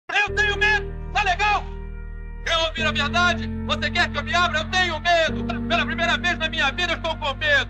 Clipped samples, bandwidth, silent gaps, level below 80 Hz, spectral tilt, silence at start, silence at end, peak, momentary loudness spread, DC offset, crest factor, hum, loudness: under 0.1%; 10.5 kHz; none; -34 dBFS; -3.5 dB/octave; 0.1 s; 0 s; -8 dBFS; 7 LU; under 0.1%; 16 dB; none; -21 LUFS